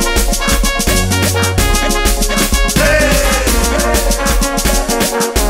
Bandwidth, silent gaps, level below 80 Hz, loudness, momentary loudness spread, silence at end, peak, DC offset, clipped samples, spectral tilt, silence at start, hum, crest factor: 16.5 kHz; none; -16 dBFS; -13 LUFS; 3 LU; 0 s; 0 dBFS; under 0.1%; under 0.1%; -3 dB/octave; 0 s; none; 12 dB